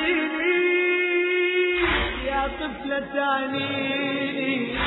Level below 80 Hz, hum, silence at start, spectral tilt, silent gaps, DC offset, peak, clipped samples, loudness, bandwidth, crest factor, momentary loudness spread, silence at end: -42 dBFS; none; 0 s; -8 dB/octave; none; under 0.1%; -10 dBFS; under 0.1%; -23 LUFS; 4.1 kHz; 14 dB; 6 LU; 0 s